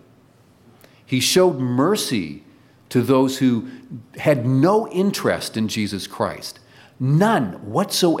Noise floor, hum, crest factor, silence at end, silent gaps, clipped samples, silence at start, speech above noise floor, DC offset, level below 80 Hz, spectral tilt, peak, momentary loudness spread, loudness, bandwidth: -53 dBFS; none; 16 dB; 0 s; none; under 0.1%; 1.1 s; 34 dB; under 0.1%; -60 dBFS; -5 dB/octave; -4 dBFS; 12 LU; -20 LUFS; 16.5 kHz